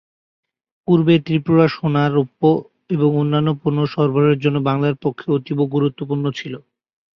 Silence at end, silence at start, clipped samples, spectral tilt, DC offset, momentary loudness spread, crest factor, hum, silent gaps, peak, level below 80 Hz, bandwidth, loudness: 0.6 s; 0.9 s; under 0.1%; -9 dB/octave; under 0.1%; 8 LU; 16 dB; none; none; -2 dBFS; -58 dBFS; 6.2 kHz; -18 LUFS